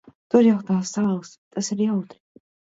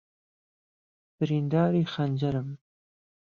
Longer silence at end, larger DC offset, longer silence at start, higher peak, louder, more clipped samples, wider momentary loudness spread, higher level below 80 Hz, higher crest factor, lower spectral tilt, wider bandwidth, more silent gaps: about the same, 0.65 s vs 0.75 s; neither; second, 0.35 s vs 1.2 s; first, -2 dBFS vs -12 dBFS; first, -22 LUFS vs -27 LUFS; neither; about the same, 13 LU vs 12 LU; about the same, -68 dBFS vs -64 dBFS; about the same, 20 dB vs 18 dB; second, -6 dB/octave vs -9 dB/octave; first, 8 kHz vs 7 kHz; first, 1.38-1.51 s vs none